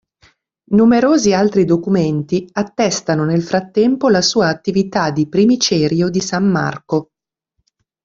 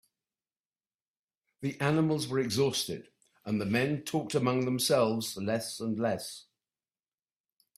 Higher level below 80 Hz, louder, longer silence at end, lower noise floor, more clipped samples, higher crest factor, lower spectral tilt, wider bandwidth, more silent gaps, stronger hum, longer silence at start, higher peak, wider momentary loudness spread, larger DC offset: first, -52 dBFS vs -70 dBFS; first, -15 LUFS vs -30 LUFS; second, 1 s vs 1.35 s; second, -71 dBFS vs under -90 dBFS; neither; second, 14 dB vs 20 dB; about the same, -5 dB/octave vs -5 dB/octave; second, 7.8 kHz vs 16 kHz; neither; neither; second, 0.7 s vs 1.6 s; first, -2 dBFS vs -12 dBFS; second, 7 LU vs 11 LU; neither